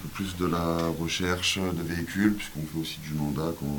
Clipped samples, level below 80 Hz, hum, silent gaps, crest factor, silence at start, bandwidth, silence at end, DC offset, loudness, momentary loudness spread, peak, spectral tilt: under 0.1%; -48 dBFS; none; none; 18 dB; 0 s; 18 kHz; 0 s; under 0.1%; -29 LUFS; 7 LU; -10 dBFS; -4.5 dB/octave